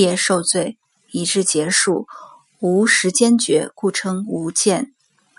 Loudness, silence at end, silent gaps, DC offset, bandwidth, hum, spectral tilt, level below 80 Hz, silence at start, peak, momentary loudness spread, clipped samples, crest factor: -17 LUFS; 0.5 s; none; under 0.1%; 11.5 kHz; none; -3 dB/octave; -68 dBFS; 0 s; -2 dBFS; 10 LU; under 0.1%; 18 dB